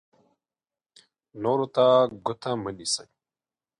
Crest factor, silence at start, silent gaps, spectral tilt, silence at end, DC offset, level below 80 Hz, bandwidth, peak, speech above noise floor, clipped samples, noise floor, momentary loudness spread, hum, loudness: 20 dB; 1.35 s; none; -4.5 dB/octave; 0.75 s; under 0.1%; -66 dBFS; 11 kHz; -8 dBFS; over 66 dB; under 0.1%; under -90 dBFS; 11 LU; none; -25 LUFS